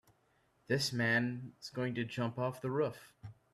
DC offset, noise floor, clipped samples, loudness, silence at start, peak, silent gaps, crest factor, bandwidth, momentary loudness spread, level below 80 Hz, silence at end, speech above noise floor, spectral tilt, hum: under 0.1%; -73 dBFS; under 0.1%; -36 LUFS; 0.7 s; -18 dBFS; none; 20 dB; 14.5 kHz; 16 LU; -72 dBFS; 0.2 s; 37 dB; -5 dB/octave; none